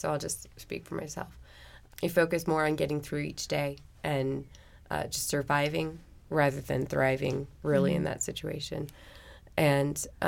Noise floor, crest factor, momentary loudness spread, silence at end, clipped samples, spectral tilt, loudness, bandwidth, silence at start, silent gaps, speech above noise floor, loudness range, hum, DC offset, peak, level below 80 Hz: -52 dBFS; 18 dB; 14 LU; 0 s; under 0.1%; -5 dB/octave; -31 LUFS; 17 kHz; 0 s; none; 22 dB; 3 LU; none; under 0.1%; -12 dBFS; -54 dBFS